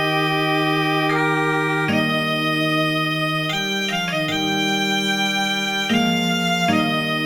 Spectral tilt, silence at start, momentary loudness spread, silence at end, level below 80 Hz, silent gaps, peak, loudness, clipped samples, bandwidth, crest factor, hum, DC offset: -4.5 dB/octave; 0 s; 2 LU; 0 s; -56 dBFS; none; -6 dBFS; -19 LUFS; under 0.1%; 19 kHz; 14 dB; none; under 0.1%